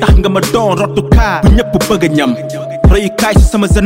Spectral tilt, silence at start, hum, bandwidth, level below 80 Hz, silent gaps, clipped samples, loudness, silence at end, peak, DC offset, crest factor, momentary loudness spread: -6 dB/octave; 0 s; none; 16.5 kHz; -14 dBFS; none; under 0.1%; -11 LUFS; 0 s; 0 dBFS; under 0.1%; 8 dB; 4 LU